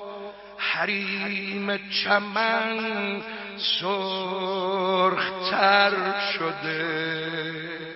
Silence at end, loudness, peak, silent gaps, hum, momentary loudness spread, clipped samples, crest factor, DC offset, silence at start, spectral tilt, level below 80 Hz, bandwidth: 0 s; -25 LUFS; -4 dBFS; none; none; 9 LU; under 0.1%; 22 dB; under 0.1%; 0 s; -7 dB/octave; -68 dBFS; 6 kHz